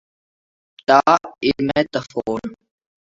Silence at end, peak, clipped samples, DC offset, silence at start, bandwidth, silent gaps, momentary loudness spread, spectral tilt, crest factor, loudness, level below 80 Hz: 0.55 s; 0 dBFS; under 0.1%; under 0.1%; 0.9 s; 7.8 kHz; none; 14 LU; -5.5 dB/octave; 20 dB; -19 LUFS; -54 dBFS